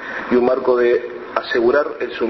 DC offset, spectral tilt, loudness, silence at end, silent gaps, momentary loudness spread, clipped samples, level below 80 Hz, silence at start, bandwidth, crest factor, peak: under 0.1%; -6.5 dB/octave; -18 LUFS; 0 s; none; 8 LU; under 0.1%; -54 dBFS; 0 s; 6 kHz; 16 dB; -2 dBFS